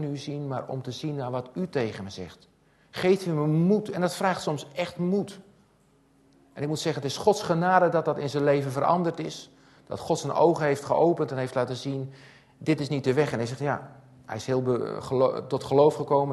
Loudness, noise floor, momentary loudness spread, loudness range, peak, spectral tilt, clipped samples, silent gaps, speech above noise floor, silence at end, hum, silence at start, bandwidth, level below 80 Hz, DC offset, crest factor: -26 LUFS; -62 dBFS; 13 LU; 5 LU; -6 dBFS; -6.5 dB/octave; under 0.1%; none; 36 dB; 0 s; none; 0 s; 12.5 kHz; -64 dBFS; under 0.1%; 20 dB